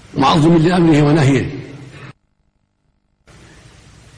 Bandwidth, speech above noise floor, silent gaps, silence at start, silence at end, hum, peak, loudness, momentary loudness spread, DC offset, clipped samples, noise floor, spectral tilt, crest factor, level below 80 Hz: 10.5 kHz; 52 dB; none; 0.15 s; 2.05 s; none; -4 dBFS; -13 LUFS; 23 LU; under 0.1%; under 0.1%; -63 dBFS; -7 dB/octave; 12 dB; -42 dBFS